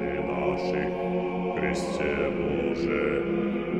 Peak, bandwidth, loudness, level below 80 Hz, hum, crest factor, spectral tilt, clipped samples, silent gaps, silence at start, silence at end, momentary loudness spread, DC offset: -12 dBFS; 11 kHz; -28 LUFS; -46 dBFS; none; 16 dB; -6.5 dB/octave; under 0.1%; none; 0 s; 0 s; 2 LU; under 0.1%